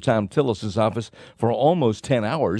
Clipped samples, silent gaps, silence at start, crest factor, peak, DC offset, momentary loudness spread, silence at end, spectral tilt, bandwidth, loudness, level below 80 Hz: under 0.1%; none; 0 s; 16 dB; -6 dBFS; under 0.1%; 7 LU; 0 s; -7 dB/octave; 11 kHz; -22 LUFS; -54 dBFS